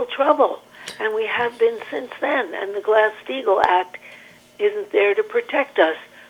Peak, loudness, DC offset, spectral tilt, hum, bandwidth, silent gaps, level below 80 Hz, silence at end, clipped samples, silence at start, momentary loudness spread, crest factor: -2 dBFS; -20 LUFS; under 0.1%; -3.5 dB/octave; 60 Hz at -60 dBFS; 13.5 kHz; none; -68 dBFS; 0.25 s; under 0.1%; 0 s; 11 LU; 20 dB